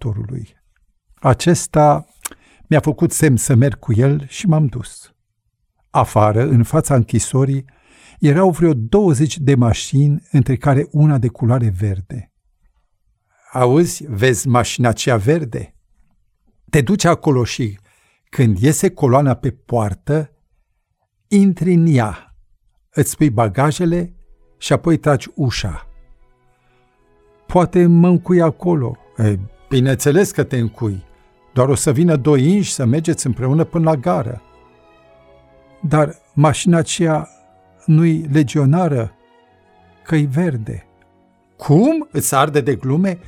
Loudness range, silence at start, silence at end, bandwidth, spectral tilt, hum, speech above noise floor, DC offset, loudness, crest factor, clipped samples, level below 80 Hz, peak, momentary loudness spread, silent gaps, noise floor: 4 LU; 0 s; 0.1 s; 16 kHz; -6.5 dB/octave; none; 54 dB; under 0.1%; -16 LUFS; 16 dB; under 0.1%; -42 dBFS; -2 dBFS; 12 LU; none; -69 dBFS